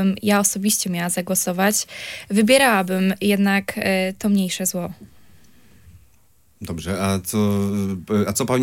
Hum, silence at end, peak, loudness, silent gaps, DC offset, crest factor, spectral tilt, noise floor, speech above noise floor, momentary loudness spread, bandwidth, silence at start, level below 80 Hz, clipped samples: none; 0 s; -2 dBFS; -20 LUFS; none; under 0.1%; 18 dB; -4 dB/octave; -59 dBFS; 39 dB; 11 LU; 17 kHz; 0 s; -56 dBFS; under 0.1%